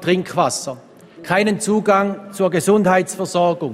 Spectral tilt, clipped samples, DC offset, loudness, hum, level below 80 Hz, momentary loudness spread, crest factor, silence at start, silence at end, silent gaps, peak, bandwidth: -5 dB/octave; under 0.1%; under 0.1%; -18 LUFS; none; -60 dBFS; 10 LU; 16 dB; 0 s; 0 s; none; -2 dBFS; 16 kHz